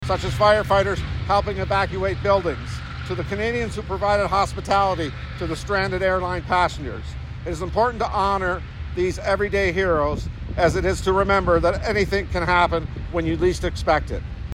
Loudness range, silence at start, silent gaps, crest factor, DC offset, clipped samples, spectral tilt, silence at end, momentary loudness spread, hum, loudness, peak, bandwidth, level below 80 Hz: 3 LU; 0 s; none; 16 dB; under 0.1%; under 0.1%; -6 dB/octave; 0 s; 11 LU; none; -22 LUFS; -4 dBFS; 15 kHz; -32 dBFS